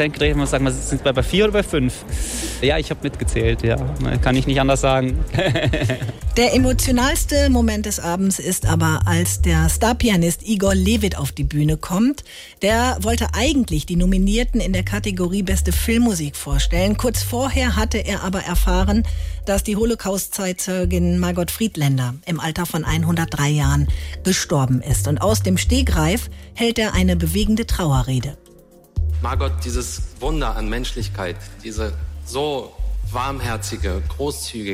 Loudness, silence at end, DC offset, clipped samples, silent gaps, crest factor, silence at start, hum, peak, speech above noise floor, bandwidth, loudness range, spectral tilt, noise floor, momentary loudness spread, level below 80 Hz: -20 LUFS; 0 s; under 0.1%; under 0.1%; none; 14 dB; 0 s; none; -4 dBFS; 28 dB; 16 kHz; 7 LU; -5 dB/octave; -47 dBFS; 8 LU; -26 dBFS